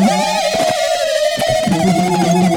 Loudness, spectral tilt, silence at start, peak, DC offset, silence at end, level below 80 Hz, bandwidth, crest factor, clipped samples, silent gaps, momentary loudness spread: -15 LUFS; -4.5 dB/octave; 0 s; -2 dBFS; under 0.1%; 0 s; -44 dBFS; over 20 kHz; 12 dB; under 0.1%; none; 2 LU